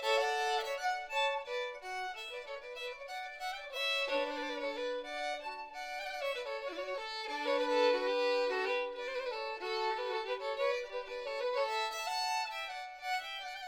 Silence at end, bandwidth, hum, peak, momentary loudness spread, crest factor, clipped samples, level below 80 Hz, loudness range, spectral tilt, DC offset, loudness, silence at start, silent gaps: 0 s; 19.5 kHz; none; -20 dBFS; 10 LU; 18 dB; under 0.1%; -70 dBFS; 4 LU; 0 dB/octave; under 0.1%; -36 LUFS; 0 s; none